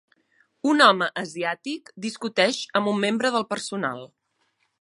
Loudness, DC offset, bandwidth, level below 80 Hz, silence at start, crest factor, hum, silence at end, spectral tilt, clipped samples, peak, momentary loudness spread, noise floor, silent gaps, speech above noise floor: -23 LUFS; under 0.1%; 11.5 kHz; -78 dBFS; 0.65 s; 22 dB; none; 0.75 s; -3.5 dB/octave; under 0.1%; -2 dBFS; 15 LU; -71 dBFS; none; 48 dB